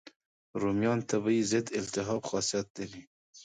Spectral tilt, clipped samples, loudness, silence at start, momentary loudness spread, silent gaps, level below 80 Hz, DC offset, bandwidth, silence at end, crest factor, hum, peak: -4.5 dB/octave; under 0.1%; -31 LUFS; 0.05 s; 14 LU; 0.16-0.20 s, 0.26-0.54 s, 2.70-2.75 s, 3.07-3.33 s; -64 dBFS; under 0.1%; 9.6 kHz; 0 s; 18 dB; none; -14 dBFS